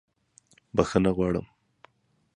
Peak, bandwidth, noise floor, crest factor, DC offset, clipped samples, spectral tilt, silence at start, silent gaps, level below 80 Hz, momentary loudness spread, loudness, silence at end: -4 dBFS; 10.5 kHz; -70 dBFS; 24 dB; under 0.1%; under 0.1%; -7 dB/octave; 0.75 s; none; -48 dBFS; 7 LU; -26 LUFS; 0.9 s